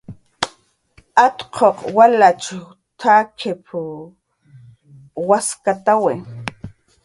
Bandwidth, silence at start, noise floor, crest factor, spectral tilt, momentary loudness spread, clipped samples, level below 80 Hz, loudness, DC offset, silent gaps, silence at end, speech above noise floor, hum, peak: 11.5 kHz; 0.1 s; -54 dBFS; 18 dB; -4 dB/octave; 17 LU; under 0.1%; -56 dBFS; -17 LUFS; under 0.1%; none; 0.35 s; 38 dB; none; 0 dBFS